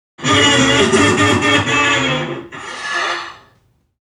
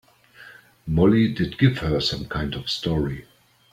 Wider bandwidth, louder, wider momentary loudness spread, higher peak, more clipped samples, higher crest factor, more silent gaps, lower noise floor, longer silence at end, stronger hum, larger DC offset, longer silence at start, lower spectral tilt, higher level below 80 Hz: second, 12.5 kHz vs 15 kHz; first, -13 LUFS vs -22 LUFS; first, 15 LU vs 11 LU; first, 0 dBFS vs -4 dBFS; neither; second, 14 dB vs 20 dB; neither; first, -57 dBFS vs -48 dBFS; first, 0.65 s vs 0.5 s; neither; neither; second, 0.2 s vs 0.4 s; second, -3.5 dB/octave vs -6.5 dB/octave; about the same, -44 dBFS vs -42 dBFS